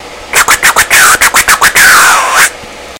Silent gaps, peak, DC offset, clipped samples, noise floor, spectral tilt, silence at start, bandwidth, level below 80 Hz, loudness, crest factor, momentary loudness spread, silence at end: none; 0 dBFS; under 0.1%; 7%; -25 dBFS; 1 dB/octave; 0 s; over 20 kHz; -34 dBFS; -4 LUFS; 6 dB; 6 LU; 0 s